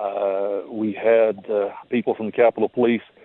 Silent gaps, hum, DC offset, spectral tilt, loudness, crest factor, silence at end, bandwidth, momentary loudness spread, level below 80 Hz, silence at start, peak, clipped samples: none; none; under 0.1%; -10 dB/octave; -21 LUFS; 16 dB; 0.2 s; 4.1 kHz; 7 LU; -72 dBFS; 0 s; -4 dBFS; under 0.1%